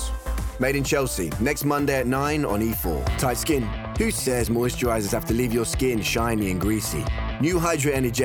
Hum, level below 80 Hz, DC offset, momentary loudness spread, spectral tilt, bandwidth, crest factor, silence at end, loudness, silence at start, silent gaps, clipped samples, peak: none; -34 dBFS; under 0.1%; 4 LU; -5 dB/octave; 19.5 kHz; 14 dB; 0 s; -24 LUFS; 0 s; none; under 0.1%; -10 dBFS